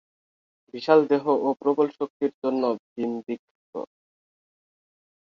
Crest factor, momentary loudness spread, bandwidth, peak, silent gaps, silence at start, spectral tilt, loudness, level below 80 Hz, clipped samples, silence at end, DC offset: 22 dB; 17 LU; 6.6 kHz; -4 dBFS; 2.10-2.20 s, 2.34-2.42 s, 2.79-2.96 s, 3.39-3.73 s; 0.75 s; -7.5 dB/octave; -24 LUFS; -76 dBFS; under 0.1%; 1.35 s; under 0.1%